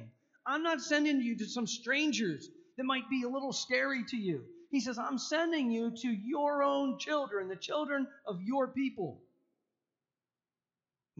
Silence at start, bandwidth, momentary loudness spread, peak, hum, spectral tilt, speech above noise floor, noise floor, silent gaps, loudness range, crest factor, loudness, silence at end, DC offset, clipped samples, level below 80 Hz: 0 s; 7.8 kHz; 8 LU; -16 dBFS; none; -2.5 dB/octave; over 56 dB; under -90 dBFS; none; 5 LU; 18 dB; -34 LUFS; 2 s; under 0.1%; under 0.1%; -84 dBFS